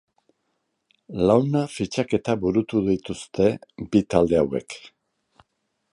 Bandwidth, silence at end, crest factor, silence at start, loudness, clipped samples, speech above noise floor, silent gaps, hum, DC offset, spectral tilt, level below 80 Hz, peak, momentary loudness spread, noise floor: 11.5 kHz; 1.05 s; 22 dB; 1.1 s; -23 LUFS; under 0.1%; 53 dB; none; none; under 0.1%; -7 dB/octave; -50 dBFS; -2 dBFS; 13 LU; -75 dBFS